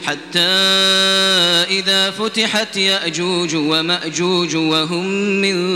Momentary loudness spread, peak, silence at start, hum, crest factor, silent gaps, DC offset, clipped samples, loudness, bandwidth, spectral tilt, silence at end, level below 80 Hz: 7 LU; 0 dBFS; 0 s; none; 16 dB; none; under 0.1%; under 0.1%; -14 LUFS; 17 kHz; -3 dB/octave; 0 s; -58 dBFS